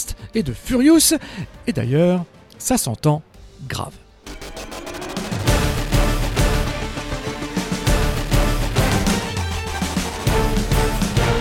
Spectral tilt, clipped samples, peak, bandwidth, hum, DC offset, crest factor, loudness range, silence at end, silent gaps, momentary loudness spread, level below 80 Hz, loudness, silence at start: -4.5 dB/octave; under 0.1%; -2 dBFS; 18 kHz; none; under 0.1%; 16 dB; 5 LU; 0 s; none; 13 LU; -26 dBFS; -20 LUFS; 0 s